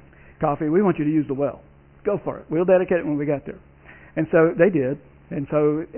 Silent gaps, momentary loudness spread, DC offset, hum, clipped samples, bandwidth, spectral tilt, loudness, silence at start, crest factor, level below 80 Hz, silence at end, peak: none; 13 LU; under 0.1%; none; under 0.1%; 3.3 kHz; -12.5 dB/octave; -22 LUFS; 0.4 s; 18 dB; -52 dBFS; 0 s; -4 dBFS